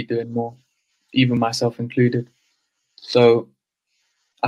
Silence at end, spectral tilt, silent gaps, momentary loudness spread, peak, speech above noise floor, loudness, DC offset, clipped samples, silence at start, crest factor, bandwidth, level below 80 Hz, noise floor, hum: 0 s; -6 dB/octave; none; 14 LU; -2 dBFS; 54 dB; -20 LUFS; under 0.1%; under 0.1%; 0 s; 20 dB; 12.5 kHz; -64 dBFS; -73 dBFS; none